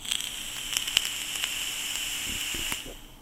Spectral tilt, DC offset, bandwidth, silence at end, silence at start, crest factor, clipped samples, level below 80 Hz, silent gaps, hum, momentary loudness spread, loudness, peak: 0.5 dB/octave; under 0.1%; 19 kHz; 0 s; 0 s; 32 dB; under 0.1%; -50 dBFS; none; none; 7 LU; -29 LUFS; 0 dBFS